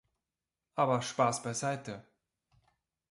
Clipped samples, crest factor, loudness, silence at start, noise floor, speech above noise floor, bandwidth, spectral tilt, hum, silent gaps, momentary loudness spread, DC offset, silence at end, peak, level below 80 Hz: under 0.1%; 22 dB; -33 LUFS; 0.75 s; under -90 dBFS; over 58 dB; 11.5 kHz; -4.5 dB/octave; none; none; 14 LU; under 0.1%; 1.1 s; -14 dBFS; -74 dBFS